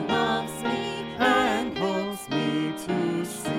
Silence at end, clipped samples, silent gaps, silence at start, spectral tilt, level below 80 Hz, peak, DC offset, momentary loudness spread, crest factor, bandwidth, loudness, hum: 0 s; under 0.1%; none; 0 s; -4.5 dB/octave; -58 dBFS; -8 dBFS; under 0.1%; 7 LU; 18 dB; 17 kHz; -26 LUFS; none